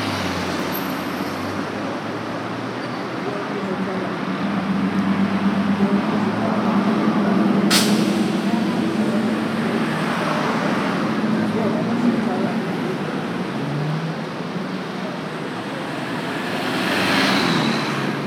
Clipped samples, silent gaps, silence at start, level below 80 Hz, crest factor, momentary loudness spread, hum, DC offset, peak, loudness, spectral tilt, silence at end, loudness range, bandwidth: under 0.1%; none; 0 s; -60 dBFS; 18 dB; 9 LU; none; under 0.1%; -2 dBFS; -21 LUFS; -5 dB/octave; 0 s; 7 LU; 17 kHz